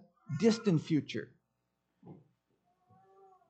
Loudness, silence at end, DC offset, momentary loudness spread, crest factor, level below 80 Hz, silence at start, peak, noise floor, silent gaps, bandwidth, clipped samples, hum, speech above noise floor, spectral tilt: -32 LUFS; 1.35 s; under 0.1%; 14 LU; 22 dB; -82 dBFS; 0.3 s; -16 dBFS; -82 dBFS; none; 8.8 kHz; under 0.1%; none; 52 dB; -6.5 dB/octave